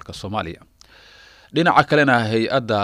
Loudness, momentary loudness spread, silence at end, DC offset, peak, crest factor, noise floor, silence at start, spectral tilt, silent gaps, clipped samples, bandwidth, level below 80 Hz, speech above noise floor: -18 LUFS; 13 LU; 0 s; under 0.1%; -2 dBFS; 18 dB; -48 dBFS; 0.1 s; -6 dB/octave; none; under 0.1%; 15 kHz; -52 dBFS; 29 dB